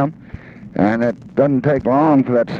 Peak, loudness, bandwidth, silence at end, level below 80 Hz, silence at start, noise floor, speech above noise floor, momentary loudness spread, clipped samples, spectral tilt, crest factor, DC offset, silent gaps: -2 dBFS; -16 LUFS; 6.6 kHz; 0 s; -48 dBFS; 0 s; -36 dBFS; 21 dB; 22 LU; under 0.1%; -9.5 dB/octave; 14 dB; under 0.1%; none